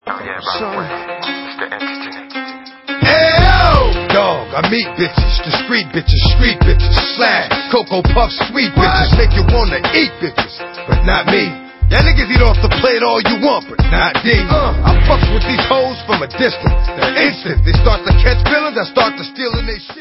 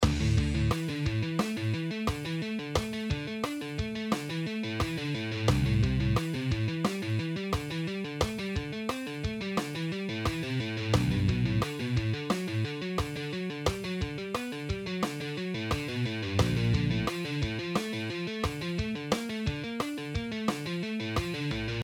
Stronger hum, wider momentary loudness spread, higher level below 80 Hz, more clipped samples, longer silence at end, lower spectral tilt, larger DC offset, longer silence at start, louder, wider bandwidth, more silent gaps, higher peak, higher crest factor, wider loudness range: neither; first, 11 LU vs 6 LU; first, -16 dBFS vs -42 dBFS; neither; about the same, 0 s vs 0 s; first, -8 dB/octave vs -6 dB/octave; neither; about the same, 0.05 s vs 0 s; first, -13 LUFS vs -32 LUFS; second, 5.8 kHz vs 18 kHz; neither; first, 0 dBFS vs -12 dBFS; second, 12 dB vs 20 dB; about the same, 2 LU vs 3 LU